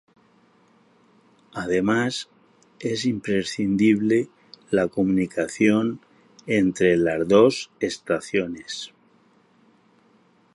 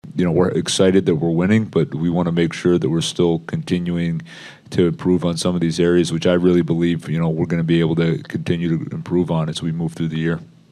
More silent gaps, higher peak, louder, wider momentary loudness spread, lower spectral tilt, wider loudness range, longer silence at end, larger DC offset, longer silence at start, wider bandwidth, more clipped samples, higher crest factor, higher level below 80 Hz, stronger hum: neither; about the same, -2 dBFS vs -2 dBFS; second, -22 LUFS vs -19 LUFS; first, 15 LU vs 7 LU; about the same, -5.5 dB/octave vs -6.5 dB/octave; first, 6 LU vs 3 LU; first, 1.65 s vs 0.3 s; neither; first, 1.55 s vs 0.05 s; about the same, 11.5 kHz vs 11.5 kHz; neither; first, 22 dB vs 16 dB; second, -58 dBFS vs -48 dBFS; neither